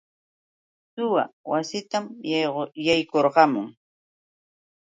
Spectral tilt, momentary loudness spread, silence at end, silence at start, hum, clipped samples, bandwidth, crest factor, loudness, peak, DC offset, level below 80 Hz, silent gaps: -4.5 dB/octave; 11 LU; 1.15 s; 0.95 s; none; under 0.1%; 9.4 kHz; 22 dB; -24 LUFS; -2 dBFS; under 0.1%; -68 dBFS; 1.33-1.44 s